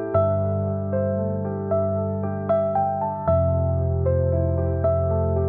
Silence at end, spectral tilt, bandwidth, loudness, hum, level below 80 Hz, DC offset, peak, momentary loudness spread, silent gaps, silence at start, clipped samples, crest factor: 0 s; -11.5 dB/octave; 3.3 kHz; -23 LUFS; none; -44 dBFS; 0.2%; -8 dBFS; 4 LU; none; 0 s; under 0.1%; 14 dB